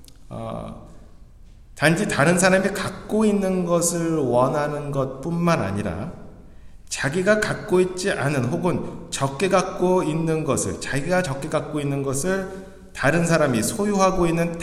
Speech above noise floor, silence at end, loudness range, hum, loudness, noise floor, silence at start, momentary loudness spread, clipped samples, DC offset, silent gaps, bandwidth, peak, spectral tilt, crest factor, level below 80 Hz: 24 dB; 0 s; 3 LU; none; -22 LUFS; -45 dBFS; 0 s; 11 LU; under 0.1%; under 0.1%; none; 15 kHz; -2 dBFS; -5 dB/octave; 20 dB; -44 dBFS